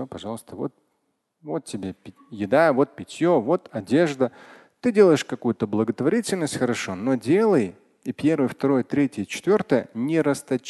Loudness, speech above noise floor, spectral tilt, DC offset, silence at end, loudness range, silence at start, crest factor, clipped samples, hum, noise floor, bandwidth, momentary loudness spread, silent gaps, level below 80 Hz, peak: -23 LUFS; 51 dB; -6 dB/octave; under 0.1%; 0 s; 3 LU; 0 s; 18 dB; under 0.1%; none; -73 dBFS; 12.5 kHz; 15 LU; none; -62 dBFS; -4 dBFS